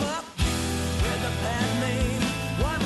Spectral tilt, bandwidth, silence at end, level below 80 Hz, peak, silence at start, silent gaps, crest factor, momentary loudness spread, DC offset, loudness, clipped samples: -4.5 dB/octave; 12.5 kHz; 0 s; -34 dBFS; -12 dBFS; 0 s; none; 14 dB; 2 LU; under 0.1%; -27 LUFS; under 0.1%